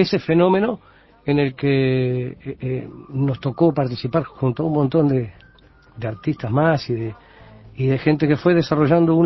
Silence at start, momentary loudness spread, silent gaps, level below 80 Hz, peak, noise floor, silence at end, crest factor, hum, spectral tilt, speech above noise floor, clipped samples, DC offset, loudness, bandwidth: 0 s; 13 LU; none; -50 dBFS; -2 dBFS; -50 dBFS; 0 s; 18 dB; none; -9 dB/octave; 31 dB; under 0.1%; under 0.1%; -20 LUFS; 6 kHz